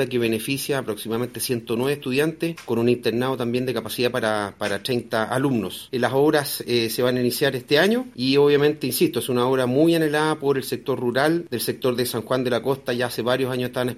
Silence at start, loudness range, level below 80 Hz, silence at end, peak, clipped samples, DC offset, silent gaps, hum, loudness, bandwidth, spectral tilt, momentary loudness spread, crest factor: 0 s; 4 LU; -60 dBFS; 0 s; -6 dBFS; under 0.1%; under 0.1%; none; none; -22 LUFS; 16 kHz; -5 dB/octave; 7 LU; 16 dB